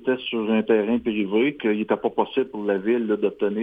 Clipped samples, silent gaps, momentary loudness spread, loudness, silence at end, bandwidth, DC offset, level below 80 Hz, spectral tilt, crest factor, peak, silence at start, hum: under 0.1%; none; 4 LU; -23 LUFS; 0 s; 3.9 kHz; under 0.1%; -62 dBFS; -8.5 dB/octave; 16 dB; -8 dBFS; 0 s; none